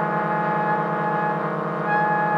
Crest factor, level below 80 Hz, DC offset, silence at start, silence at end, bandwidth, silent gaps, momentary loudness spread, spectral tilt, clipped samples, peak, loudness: 14 dB; -68 dBFS; under 0.1%; 0 s; 0 s; 6.8 kHz; none; 4 LU; -8.5 dB/octave; under 0.1%; -8 dBFS; -23 LUFS